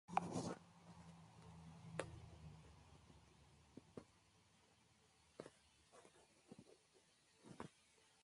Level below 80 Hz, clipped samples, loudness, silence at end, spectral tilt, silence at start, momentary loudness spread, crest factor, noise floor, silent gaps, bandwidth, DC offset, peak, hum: -74 dBFS; under 0.1%; -55 LUFS; 0 s; -5.5 dB/octave; 0.1 s; 19 LU; 32 dB; -75 dBFS; none; 11.5 kHz; under 0.1%; -24 dBFS; none